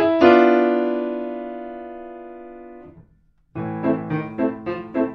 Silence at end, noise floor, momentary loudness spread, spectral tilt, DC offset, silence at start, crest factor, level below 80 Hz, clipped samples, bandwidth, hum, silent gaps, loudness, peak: 0 s; -58 dBFS; 25 LU; -8.5 dB/octave; under 0.1%; 0 s; 20 dB; -56 dBFS; under 0.1%; 5.8 kHz; none; none; -20 LUFS; 0 dBFS